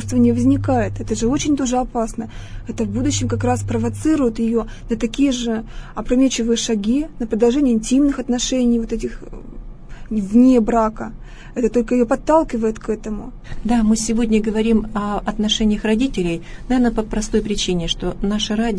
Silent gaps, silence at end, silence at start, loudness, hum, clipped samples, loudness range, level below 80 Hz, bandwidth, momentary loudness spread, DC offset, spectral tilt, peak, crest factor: none; 0 s; 0 s; -19 LUFS; none; under 0.1%; 3 LU; -32 dBFS; 11 kHz; 13 LU; under 0.1%; -5 dB/octave; -4 dBFS; 16 dB